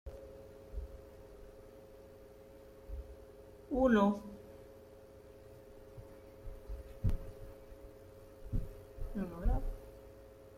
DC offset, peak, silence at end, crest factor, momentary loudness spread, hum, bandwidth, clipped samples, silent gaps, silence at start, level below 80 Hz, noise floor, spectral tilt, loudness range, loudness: under 0.1%; -18 dBFS; 0 s; 22 dB; 23 LU; none; 15.5 kHz; under 0.1%; none; 0.05 s; -44 dBFS; -56 dBFS; -8 dB/octave; 13 LU; -38 LUFS